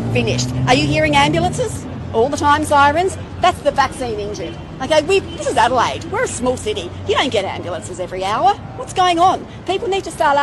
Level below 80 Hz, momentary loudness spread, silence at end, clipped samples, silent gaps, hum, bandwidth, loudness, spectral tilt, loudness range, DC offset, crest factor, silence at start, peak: -38 dBFS; 11 LU; 0 s; under 0.1%; none; none; 12.5 kHz; -17 LUFS; -4.5 dB/octave; 3 LU; under 0.1%; 16 dB; 0 s; -2 dBFS